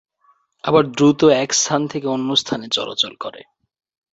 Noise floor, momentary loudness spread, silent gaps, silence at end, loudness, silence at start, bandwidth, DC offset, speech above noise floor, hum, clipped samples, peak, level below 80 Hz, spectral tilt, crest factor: -60 dBFS; 9 LU; none; 0.75 s; -17 LUFS; 0.65 s; 8 kHz; under 0.1%; 42 dB; none; under 0.1%; -2 dBFS; -58 dBFS; -3.5 dB/octave; 18 dB